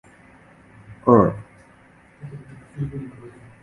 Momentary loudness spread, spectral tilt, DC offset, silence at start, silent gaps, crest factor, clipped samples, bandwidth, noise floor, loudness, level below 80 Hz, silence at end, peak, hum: 26 LU; -10.5 dB/octave; under 0.1%; 0.9 s; none; 24 dB; under 0.1%; 11 kHz; -52 dBFS; -20 LUFS; -50 dBFS; 0.35 s; 0 dBFS; none